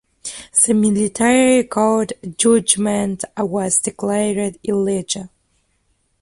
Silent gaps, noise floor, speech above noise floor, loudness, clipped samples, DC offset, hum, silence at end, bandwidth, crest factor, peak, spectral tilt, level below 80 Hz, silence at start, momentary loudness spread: none; -64 dBFS; 47 dB; -17 LUFS; under 0.1%; under 0.1%; none; 0.95 s; 11.5 kHz; 18 dB; 0 dBFS; -4 dB/octave; -54 dBFS; 0.25 s; 10 LU